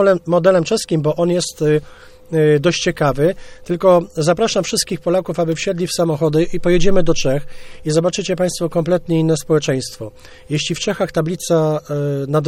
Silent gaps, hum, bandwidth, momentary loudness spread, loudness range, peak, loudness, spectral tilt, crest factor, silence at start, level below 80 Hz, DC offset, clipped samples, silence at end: none; none; 16 kHz; 7 LU; 3 LU; 0 dBFS; -17 LUFS; -5.5 dB/octave; 16 dB; 0 s; -34 dBFS; under 0.1%; under 0.1%; 0 s